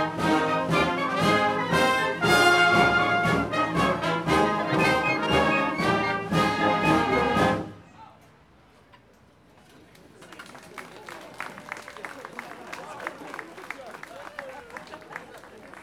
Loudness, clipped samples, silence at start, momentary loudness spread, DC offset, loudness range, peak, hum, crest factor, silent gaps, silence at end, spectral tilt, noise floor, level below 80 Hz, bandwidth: -22 LUFS; under 0.1%; 0 s; 21 LU; under 0.1%; 19 LU; -6 dBFS; none; 20 dB; none; 0 s; -5 dB/octave; -56 dBFS; -50 dBFS; 17 kHz